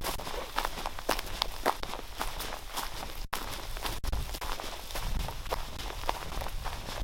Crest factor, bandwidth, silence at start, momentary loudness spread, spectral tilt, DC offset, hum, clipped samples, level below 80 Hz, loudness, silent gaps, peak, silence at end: 28 dB; 17 kHz; 0 s; 6 LU; -3 dB/octave; under 0.1%; none; under 0.1%; -38 dBFS; -36 LUFS; none; -6 dBFS; 0 s